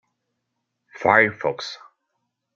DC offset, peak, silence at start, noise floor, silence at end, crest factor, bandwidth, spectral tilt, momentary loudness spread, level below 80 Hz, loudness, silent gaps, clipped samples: under 0.1%; -2 dBFS; 1 s; -78 dBFS; 0.8 s; 24 dB; 7.6 kHz; -5 dB/octave; 17 LU; -68 dBFS; -19 LUFS; none; under 0.1%